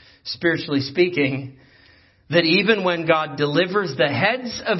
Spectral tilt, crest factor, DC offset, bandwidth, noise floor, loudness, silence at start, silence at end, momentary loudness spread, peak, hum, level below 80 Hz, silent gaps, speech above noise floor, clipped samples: -6 dB/octave; 18 dB; under 0.1%; 6 kHz; -54 dBFS; -20 LUFS; 0.25 s; 0 s; 7 LU; -2 dBFS; none; -60 dBFS; none; 33 dB; under 0.1%